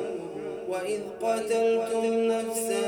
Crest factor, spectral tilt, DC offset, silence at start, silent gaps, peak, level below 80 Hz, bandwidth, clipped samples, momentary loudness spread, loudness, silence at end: 12 dB; -3.5 dB/octave; under 0.1%; 0 s; none; -16 dBFS; -70 dBFS; 20 kHz; under 0.1%; 10 LU; -28 LUFS; 0 s